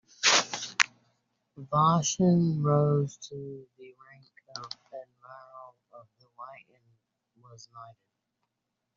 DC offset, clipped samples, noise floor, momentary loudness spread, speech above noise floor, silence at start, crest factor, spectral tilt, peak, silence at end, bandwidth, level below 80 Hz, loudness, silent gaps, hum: under 0.1%; under 0.1%; -84 dBFS; 25 LU; 57 dB; 0.2 s; 30 dB; -4 dB/octave; 0 dBFS; 1.05 s; 7.8 kHz; -70 dBFS; -25 LUFS; none; none